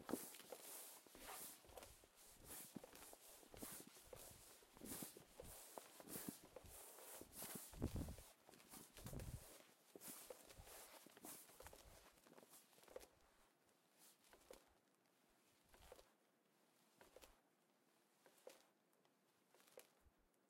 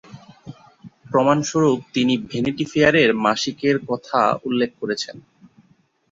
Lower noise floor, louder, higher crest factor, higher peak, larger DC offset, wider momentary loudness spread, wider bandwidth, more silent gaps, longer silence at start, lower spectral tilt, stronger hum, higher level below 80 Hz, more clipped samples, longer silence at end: first, -81 dBFS vs -60 dBFS; second, -58 LUFS vs -20 LUFS; first, 28 dB vs 20 dB; second, -32 dBFS vs -2 dBFS; neither; first, 14 LU vs 8 LU; first, 16.5 kHz vs 7.8 kHz; neither; about the same, 0 s vs 0.1 s; about the same, -4 dB/octave vs -5 dB/octave; neither; second, -70 dBFS vs -56 dBFS; neither; second, 0.05 s vs 0.95 s